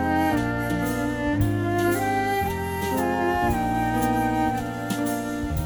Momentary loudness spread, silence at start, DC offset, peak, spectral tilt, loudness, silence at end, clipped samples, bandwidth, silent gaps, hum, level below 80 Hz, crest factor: 4 LU; 0 s; under 0.1%; -8 dBFS; -6 dB/octave; -24 LUFS; 0 s; under 0.1%; over 20 kHz; none; none; -38 dBFS; 16 dB